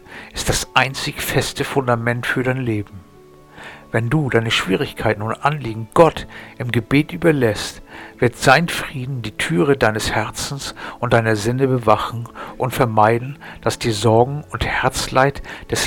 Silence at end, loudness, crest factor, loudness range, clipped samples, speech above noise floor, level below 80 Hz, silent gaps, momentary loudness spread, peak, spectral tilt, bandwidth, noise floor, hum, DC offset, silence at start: 0 s; -19 LUFS; 18 dB; 3 LU; under 0.1%; 26 dB; -40 dBFS; none; 13 LU; 0 dBFS; -5 dB/octave; 19 kHz; -45 dBFS; none; under 0.1%; 0.1 s